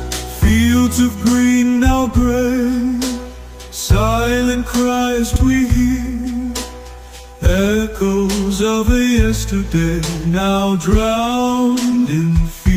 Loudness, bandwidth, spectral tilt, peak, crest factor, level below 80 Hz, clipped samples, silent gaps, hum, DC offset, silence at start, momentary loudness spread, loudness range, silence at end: -16 LUFS; 16 kHz; -5.5 dB/octave; -2 dBFS; 14 dB; -22 dBFS; under 0.1%; none; none; under 0.1%; 0 s; 10 LU; 3 LU; 0 s